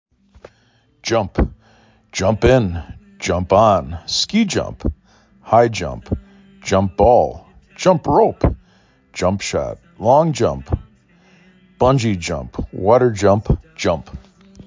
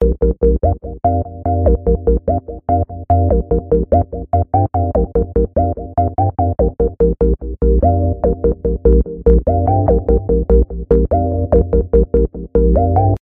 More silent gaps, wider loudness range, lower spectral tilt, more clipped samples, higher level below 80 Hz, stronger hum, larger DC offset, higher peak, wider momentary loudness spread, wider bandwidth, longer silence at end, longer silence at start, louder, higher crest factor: neither; about the same, 3 LU vs 2 LU; second, -5.5 dB/octave vs -13.5 dB/octave; neither; second, -32 dBFS vs -18 dBFS; neither; neither; about the same, 0 dBFS vs 0 dBFS; first, 14 LU vs 4 LU; first, 7.6 kHz vs 2.2 kHz; about the same, 0.05 s vs 0.05 s; first, 1.05 s vs 0 s; about the same, -18 LUFS vs -16 LUFS; about the same, 18 dB vs 14 dB